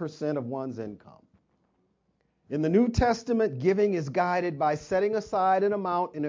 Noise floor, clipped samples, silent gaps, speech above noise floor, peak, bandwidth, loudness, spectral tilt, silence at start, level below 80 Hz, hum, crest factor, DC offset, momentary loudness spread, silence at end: -73 dBFS; under 0.1%; none; 46 dB; -10 dBFS; 7.6 kHz; -27 LUFS; -7 dB/octave; 0 s; -48 dBFS; none; 16 dB; under 0.1%; 10 LU; 0 s